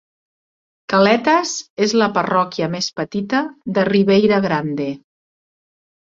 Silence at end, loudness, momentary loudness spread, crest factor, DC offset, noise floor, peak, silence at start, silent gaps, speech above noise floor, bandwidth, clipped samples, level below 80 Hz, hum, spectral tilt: 1.05 s; -17 LUFS; 11 LU; 16 dB; under 0.1%; under -90 dBFS; -2 dBFS; 0.9 s; 1.70-1.77 s; over 73 dB; 7.8 kHz; under 0.1%; -58 dBFS; none; -5 dB/octave